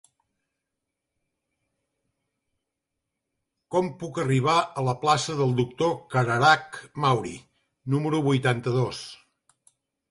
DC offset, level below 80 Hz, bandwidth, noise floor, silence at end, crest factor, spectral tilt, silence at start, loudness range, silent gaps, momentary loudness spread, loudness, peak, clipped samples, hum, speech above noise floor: under 0.1%; -62 dBFS; 11.5 kHz; -84 dBFS; 0.95 s; 22 dB; -5.5 dB/octave; 3.7 s; 8 LU; none; 14 LU; -24 LUFS; -6 dBFS; under 0.1%; none; 59 dB